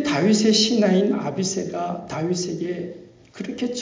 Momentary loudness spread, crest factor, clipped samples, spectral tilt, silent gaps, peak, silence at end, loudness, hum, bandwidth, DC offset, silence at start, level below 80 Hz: 14 LU; 16 dB; under 0.1%; -4.5 dB/octave; none; -6 dBFS; 0 s; -21 LUFS; none; 7.6 kHz; under 0.1%; 0 s; -60 dBFS